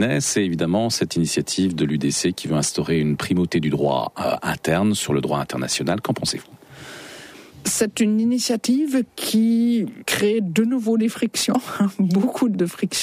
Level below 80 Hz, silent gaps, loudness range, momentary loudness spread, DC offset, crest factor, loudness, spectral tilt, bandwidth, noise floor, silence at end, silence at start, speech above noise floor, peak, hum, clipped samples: -54 dBFS; none; 3 LU; 5 LU; under 0.1%; 14 dB; -21 LUFS; -4.5 dB/octave; 15.5 kHz; -41 dBFS; 0 s; 0 s; 21 dB; -8 dBFS; none; under 0.1%